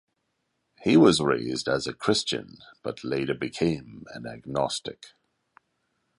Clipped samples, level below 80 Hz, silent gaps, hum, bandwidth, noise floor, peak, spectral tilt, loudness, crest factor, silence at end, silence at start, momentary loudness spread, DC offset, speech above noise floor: under 0.1%; -58 dBFS; none; none; 11.5 kHz; -77 dBFS; -6 dBFS; -5 dB/octave; -25 LUFS; 22 dB; 1.1 s; 0.8 s; 20 LU; under 0.1%; 51 dB